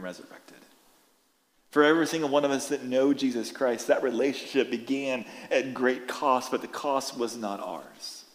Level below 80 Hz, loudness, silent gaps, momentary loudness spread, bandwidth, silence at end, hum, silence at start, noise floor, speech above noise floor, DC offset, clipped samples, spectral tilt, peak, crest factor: -80 dBFS; -27 LUFS; none; 11 LU; 16 kHz; 0.1 s; none; 0 s; -68 dBFS; 40 dB; under 0.1%; under 0.1%; -4 dB/octave; -8 dBFS; 20 dB